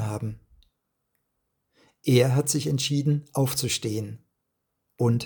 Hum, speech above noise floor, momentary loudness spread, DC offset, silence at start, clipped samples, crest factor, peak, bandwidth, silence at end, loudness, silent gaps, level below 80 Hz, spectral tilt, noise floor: none; 55 dB; 15 LU; under 0.1%; 0 s; under 0.1%; 20 dB; -6 dBFS; 19 kHz; 0 s; -25 LUFS; none; -62 dBFS; -5 dB/octave; -79 dBFS